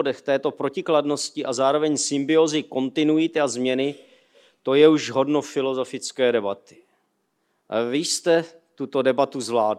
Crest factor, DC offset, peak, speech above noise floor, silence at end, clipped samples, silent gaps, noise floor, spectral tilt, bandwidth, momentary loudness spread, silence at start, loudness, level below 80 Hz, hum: 20 dB; under 0.1%; -2 dBFS; 50 dB; 0 s; under 0.1%; none; -71 dBFS; -4 dB/octave; 13 kHz; 8 LU; 0 s; -22 LUFS; -80 dBFS; none